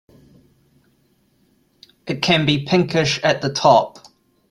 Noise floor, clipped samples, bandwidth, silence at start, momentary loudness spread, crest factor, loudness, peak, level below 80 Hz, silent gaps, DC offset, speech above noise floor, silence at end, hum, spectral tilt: -61 dBFS; under 0.1%; 12.5 kHz; 2.05 s; 14 LU; 18 dB; -17 LUFS; -2 dBFS; -56 dBFS; none; under 0.1%; 44 dB; 0.6 s; none; -5 dB/octave